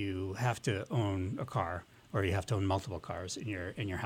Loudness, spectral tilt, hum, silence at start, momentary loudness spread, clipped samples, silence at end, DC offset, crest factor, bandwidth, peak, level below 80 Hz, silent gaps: -36 LUFS; -6 dB/octave; none; 0 s; 7 LU; under 0.1%; 0 s; under 0.1%; 18 dB; 16 kHz; -16 dBFS; -58 dBFS; none